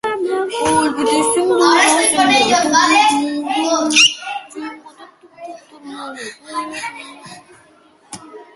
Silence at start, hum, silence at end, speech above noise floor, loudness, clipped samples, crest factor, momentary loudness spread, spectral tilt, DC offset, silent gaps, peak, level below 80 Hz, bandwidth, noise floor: 0.05 s; none; 0.15 s; 36 dB; -13 LUFS; under 0.1%; 16 dB; 24 LU; -1.5 dB/octave; under 0.1%; none; 0 dBFS; -56 dBFS; 12 kHz; -50 dBFS